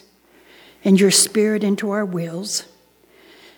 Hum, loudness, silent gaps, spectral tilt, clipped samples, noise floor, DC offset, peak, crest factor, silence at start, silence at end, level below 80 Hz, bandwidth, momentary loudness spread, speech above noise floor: none; -18 LUFS; none; -4 dB/octave; under 0.1%; -54 dBFS; under 0.1%; -2 dBFS; 18 dB; 0.85 s; 0.95 s; -70 dBFS; 19.5 kHz; 12 LU; 36 dB